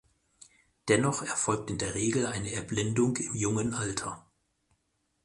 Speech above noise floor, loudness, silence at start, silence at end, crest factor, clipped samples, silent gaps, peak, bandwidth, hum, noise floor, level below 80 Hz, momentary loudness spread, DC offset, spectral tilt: 47 dB; -30 LUFS; 0.85 s; 1.05 s; 20 dB; under 0.1%; none; -10 dBFS; 11.5 kHz; none; -76 dBFS; -56 dBFS; 8 LU; under 0.1%; -4.5 dB/octave